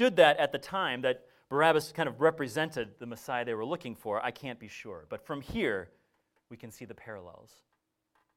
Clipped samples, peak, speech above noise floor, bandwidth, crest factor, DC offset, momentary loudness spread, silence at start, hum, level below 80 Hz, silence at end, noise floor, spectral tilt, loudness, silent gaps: under 0.1%; -8 dBFS; 46 dB; 16 kHz; 24 dB; under 0.1%; 20 LU; 0 s; none; -64 dBFS; 1.05 s; -77 dBFS; -4.5 dB/octave; -30 LUFS; none